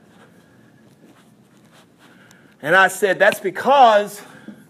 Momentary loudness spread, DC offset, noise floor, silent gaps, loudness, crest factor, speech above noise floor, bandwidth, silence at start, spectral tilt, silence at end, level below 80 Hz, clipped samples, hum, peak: 18 LU; under 0.1%; -51 dBFS; none; -15 LUFS; 18 dB; 36 dB; 15.5 kHz; 2.65 s; -3 dB/octave; 0.15 s; -76 dBFS; under 0.1%; none; -2 dBFS